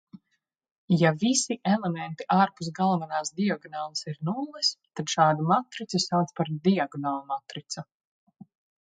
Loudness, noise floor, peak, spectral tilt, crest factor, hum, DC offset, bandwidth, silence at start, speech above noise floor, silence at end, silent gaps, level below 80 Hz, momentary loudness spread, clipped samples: -27 LUFS; -78 dBFS; -6 dBFS; -4.5 dB/octave; 20 dB; none; under 0.1%; 9.4 kHz; 0.15 s; 51 dB; 1 s; 0.71-0.88 s; -74 dBFS; 11 LU; under 0.1%